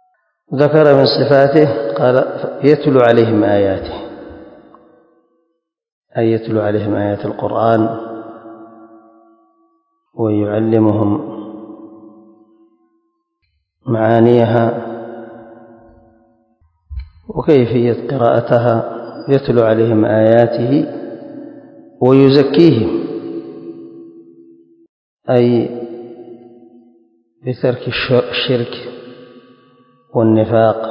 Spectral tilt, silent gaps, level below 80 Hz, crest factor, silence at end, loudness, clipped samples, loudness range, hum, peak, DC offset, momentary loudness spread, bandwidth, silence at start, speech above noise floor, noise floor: -9.5 dB/octave; 5.92-6.02 s, 24.89-25.17 s; -46 dBFS; 16 dB; 0 s; -13 LUFS; 0.2%; 8 LU; none; 0 dBFS; under 0.1%; 22 LU; 6 kHz; 0.5 s; 57 dB; -69 dBFS